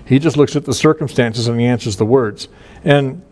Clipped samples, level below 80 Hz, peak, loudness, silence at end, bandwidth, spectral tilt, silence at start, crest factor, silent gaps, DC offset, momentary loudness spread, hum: under 0.1%; -46 dBFS; 0 dBFS; -15 LUFS; 0.1 s; 11 kHz; -6 dB/octave; 0 s; 14 dB; none; under 0.1%; 9 LU; none